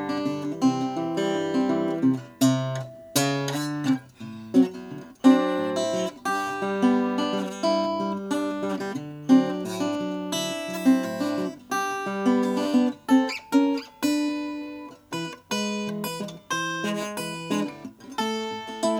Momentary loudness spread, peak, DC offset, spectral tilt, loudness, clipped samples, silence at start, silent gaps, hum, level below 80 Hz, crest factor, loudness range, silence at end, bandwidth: 11 LU; -6 dBFS; under 0.1%; -5 dB/octave; -25 LUFS; under 0.1%; 0 s; none; none; -70 dBFS; 18 dB; 5 LU; 0 s; 17 kHz